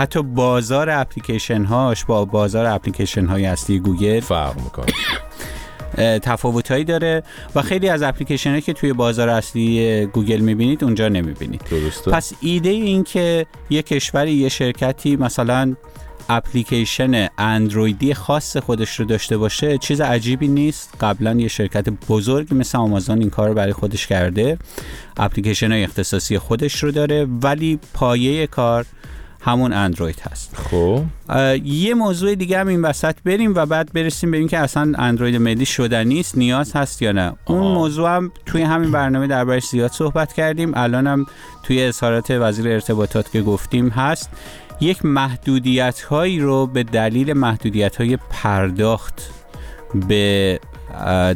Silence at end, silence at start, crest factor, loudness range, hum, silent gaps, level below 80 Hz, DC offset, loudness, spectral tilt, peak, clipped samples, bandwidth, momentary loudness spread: 0 s; 0 s; 16 dB; 2 LU; none; none; -36 dBFS; 0.1%; -18 LUFS; -5.5 dB/octave; -2 dBFS; under 0.1%; 18.5 kHz; 6 LU